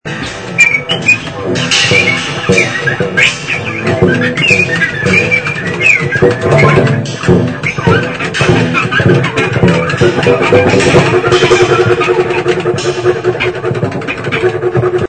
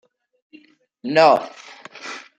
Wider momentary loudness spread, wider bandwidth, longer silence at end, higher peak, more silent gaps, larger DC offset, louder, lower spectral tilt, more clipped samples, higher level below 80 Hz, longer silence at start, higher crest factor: second, 7 LU vs 24 LU; first, 11 kHz vs 9 kHz; second, 0 s vs 0.2 s; about the same, 0 dBFS vs -2 dBFS; neither; first, 0.4% vs under 0.1%; first, -10 LUFS vs -16 LUFS; about the same, -5 dB/octave vs -4.5 dB/octave; first, 0.5% vs under 0.1%; first, -38 dBFS vs -72 dBFS; second, 0.05 s vs 1.05 s; second, 10 dB vs 20 dB